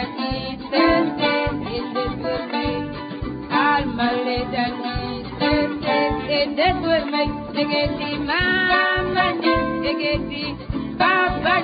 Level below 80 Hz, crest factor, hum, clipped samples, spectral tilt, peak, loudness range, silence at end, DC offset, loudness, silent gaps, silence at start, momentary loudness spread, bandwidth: -38 dBFS; 16 dB; none; under 0.1%; -10 dB/octave; -4 dBFS; 3 LU; 0 s; under 0.1%; -21 LUFS; none; 0 s; 10 LU; 5 kHz